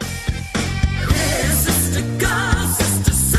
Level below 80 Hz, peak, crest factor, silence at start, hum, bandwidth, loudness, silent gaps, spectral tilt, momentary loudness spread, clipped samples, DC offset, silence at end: -26 dBFS; -2 dBFS; 16 dB; 0 s; none; 13.5 kHz; -18 LUFS; none; -4 dB/octave; 7 LU; under 0.1%; under 0.1%; 0 s